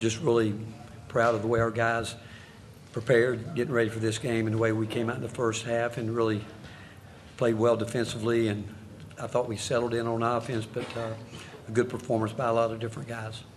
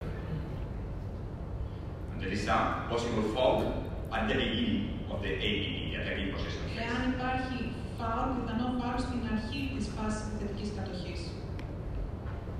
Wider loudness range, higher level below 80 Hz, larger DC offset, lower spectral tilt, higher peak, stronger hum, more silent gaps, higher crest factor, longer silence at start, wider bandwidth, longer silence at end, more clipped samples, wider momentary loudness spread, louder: about the same, 3 LU vs 4 LU; second, -60 dBFS vs -42 dBFS; neither; about the same, -6 dB/octave vs -6 dB/octave; first, -10 dBFS vs -14 dBFS; neither; neither; about the same, 18 dB vs 18 dB; about the same, 0 s vs 0 s; about the same, 13 kHz vs 13.5 kHz; about the same, 0 s vs 0 s; neither; first, 18 LU vs 10 LU; first, -28 LUFS vs -34 LUFS